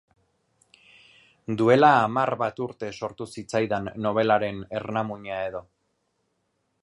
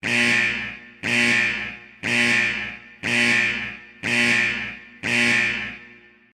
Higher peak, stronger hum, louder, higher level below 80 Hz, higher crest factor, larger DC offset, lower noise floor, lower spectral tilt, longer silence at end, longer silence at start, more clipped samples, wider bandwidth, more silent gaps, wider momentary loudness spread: about the same, -4 dBFS vs -6 dBFS; neither; second, -24 LUFS vs -20 LUFS; second, -62 dBFS vs -54 dBFS; about the same, 22 dB vs 18 dB; neither; first, -74 dBFS vs -48 dBFS; first, -6.5 dB/octave vs -2.5 dB/octave; first, 1.2 s vs 0.45 s; first, 1.5 s vs 0.05 s; neither; second, 11.5 kHz vs 13.5 kHz; neither; about the same, 16 LU vs 15 LU